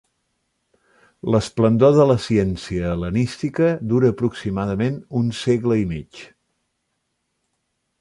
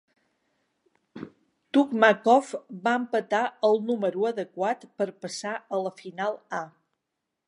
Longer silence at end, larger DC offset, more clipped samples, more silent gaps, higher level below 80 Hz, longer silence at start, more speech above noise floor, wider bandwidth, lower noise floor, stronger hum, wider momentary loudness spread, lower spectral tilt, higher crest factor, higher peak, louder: first, 1.75 s vs 0.8 s; neither; neither; neither; first, -44 dBFS vs -82 dBFS; about the same, 1.25 s vs 1.15 s; about the same, 55 dB vs 57 dB; about the same, 11.5 kHz vs 11.5 kHz; second, -74 dBFS vs -83 dBFS; neither; second, 10 LU vs 15 LU; first, -7.5 dB/octave vs -4.5 dB/octave; about the same, 18 dB vs 22 dB; about the same, -4 dBFS vs -4 dBFS; first, -20 LUFS vs -26 LUFS